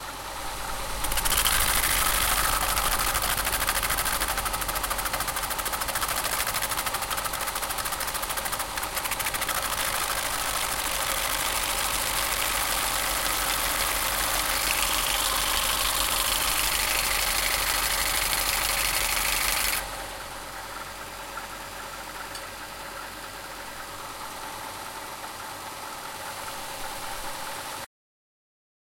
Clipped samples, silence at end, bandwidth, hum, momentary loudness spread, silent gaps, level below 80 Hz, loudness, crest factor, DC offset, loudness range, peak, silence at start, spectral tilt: under 0.1%; 0.95 s; 17 kHz; none; 13 LU; none; -40 dBFS; -25 LUFS; 22 dB; under 0.1%; 13 LU; -6 dBFS; 0 s; -0.5 dB/octave